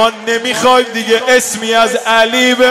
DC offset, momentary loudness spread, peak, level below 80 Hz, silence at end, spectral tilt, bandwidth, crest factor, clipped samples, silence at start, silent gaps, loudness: 0.3%; 4 LU; 0 dBFS; -52 dBFS; 0 s; -1.5 dB/octave; 16 kHz; 10 dB; under 0.1%; 0 s; none; -11 LUFS